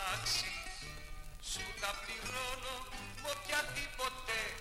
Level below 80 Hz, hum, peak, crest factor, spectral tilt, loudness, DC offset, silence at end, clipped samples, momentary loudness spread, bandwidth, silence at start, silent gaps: -52 dBFS; none; -20 dBFS; 20 dB; -1 dB/octave; -39 LUFS; under 0.1%; 0 s; under 0.1%; 12 LU; 16.5 kHz; 0 s; none